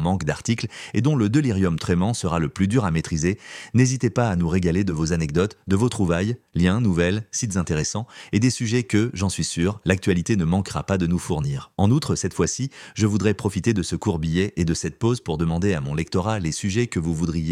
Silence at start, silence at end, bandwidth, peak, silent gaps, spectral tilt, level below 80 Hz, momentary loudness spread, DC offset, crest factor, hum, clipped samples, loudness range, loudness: 0 s; 0 s; 13.5 kHz; -2 dBFS; none; -6 dB/octave; -42 dBFS; 5 LU; under 0.1%; 20 dB; none; under 0.1%; 2 LU; -23 LUFS